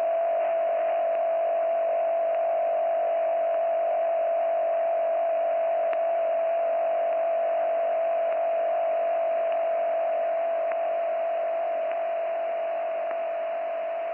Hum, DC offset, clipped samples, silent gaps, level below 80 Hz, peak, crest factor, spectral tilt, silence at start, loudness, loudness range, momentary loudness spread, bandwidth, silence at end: none; under 0.1%; under 0.1%; none; -80 dBFS; -16 dBFS; 8 dB; -5.5 dB/octave; 0 s; -26 LUFS; 2 LU; 4 LU; 3.2 kHz; 0 s